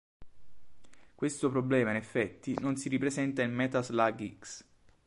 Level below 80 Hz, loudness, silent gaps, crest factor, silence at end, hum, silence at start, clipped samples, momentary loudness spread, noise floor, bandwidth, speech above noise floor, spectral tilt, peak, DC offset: -66 dBFS; -32 LUFS; none; 20 dB; 0.15 s; none; 0.2 s; under 0.1%; 13 LU; -54 dBFS; 11.5 kHz; 23 dB; -5.5 dB/octave; -12 dBFS; under 0.1%